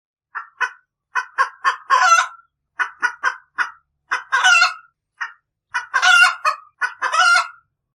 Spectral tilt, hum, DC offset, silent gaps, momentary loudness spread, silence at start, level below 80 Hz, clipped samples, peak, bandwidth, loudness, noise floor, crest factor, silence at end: 4 dB/octave; none; under 0.1%; none; 19 LU; 0.35 s; -78 dBFS; under 0.1%; 0 dBFS; 14 kHz; -17 LUFS; -47 dBFS; 20 dB; 0.45 s